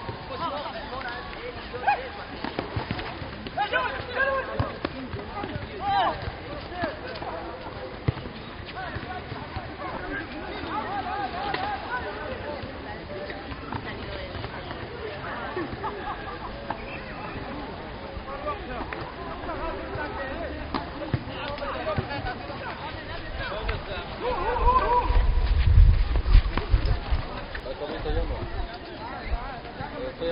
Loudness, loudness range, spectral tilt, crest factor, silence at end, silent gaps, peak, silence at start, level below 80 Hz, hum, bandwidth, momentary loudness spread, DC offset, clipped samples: -30 LUFS; 10 LU; -4.5 dB/octave; 24 dB; 0 s; none; -4 dBFS; 0 s; -32 dBFS; none; 5.4 kHz; 11 LU; under 0.1%; under 0.1%